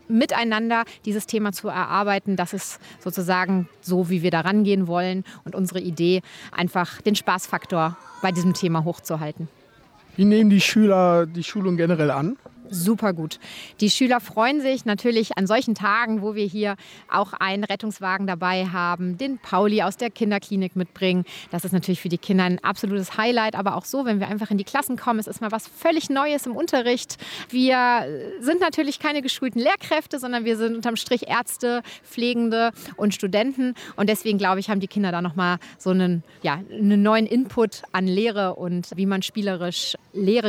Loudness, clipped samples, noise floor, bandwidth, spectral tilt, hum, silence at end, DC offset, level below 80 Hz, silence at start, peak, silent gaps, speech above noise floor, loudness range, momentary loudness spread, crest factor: -23 LUFS; under 0.1%; -53 dBFS; 16.5 kHz; -5.5 dB/octave; none; 0 s; under 0.1%; -66 dBFS; 0.1 s; -6 dBFS; none; 31 dB; 4 LU; 8 LU; 16 dB